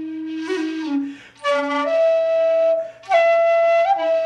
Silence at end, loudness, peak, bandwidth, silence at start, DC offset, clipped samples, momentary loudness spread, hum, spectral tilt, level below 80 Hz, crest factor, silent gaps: 0 s; -19 LUFS; -6 dBFS; 9.2 kHz; 0 s; under 0.1%; under 0.1%; 10 LU; none; -3.5 dB/octave; -72 dBFS; 12 dB; none